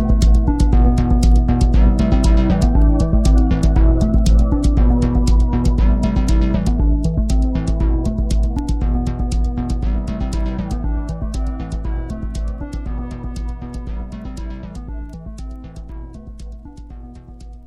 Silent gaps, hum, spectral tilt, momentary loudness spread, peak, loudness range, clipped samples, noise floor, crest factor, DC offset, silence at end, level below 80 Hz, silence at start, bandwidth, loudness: none; none; -7.5 dB/octave; 19 LU; -2 dBFS; 15 LU; under 0.1%; -35 dBFS; 14 dB; under 0.1%; 0.05 s; -16 dBFS; 0 s; 10.5 kHz; -18 LUFS